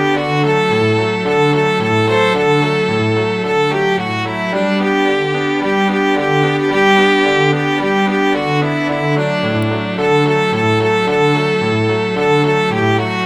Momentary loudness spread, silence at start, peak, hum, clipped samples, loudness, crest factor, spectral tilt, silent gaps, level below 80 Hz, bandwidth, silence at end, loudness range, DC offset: 4 LU; 0 s; -2 dBFS; none; under 0.1%; -14 LUFS; 14 dB; -6 dB/octave; none; -50 dBFS; 12 kHz; 0 s; 2 LU; under 0.1%